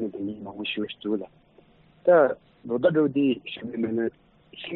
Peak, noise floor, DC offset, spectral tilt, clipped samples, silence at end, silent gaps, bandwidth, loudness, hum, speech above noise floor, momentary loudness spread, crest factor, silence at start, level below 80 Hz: -8 dBFS; -57 dBFS; under 0.1%; -4.5 dB/octave; under 0.1%; 0 s; none; 4.2 kHz; -25 LUFS; none; 33 dB; 14 LU; 18 dB; 0 s; -66 dBFS